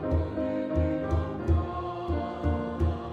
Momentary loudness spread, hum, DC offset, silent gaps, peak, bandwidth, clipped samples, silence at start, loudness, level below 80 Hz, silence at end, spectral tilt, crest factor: 4 LU; none; under 0.1%; none; -14 dBFS; 4.9 kHz; under 0.1%; 0 s; -30 LUFS; -38 dBFS; 0 s; -9.5 dB/octave; 14 dB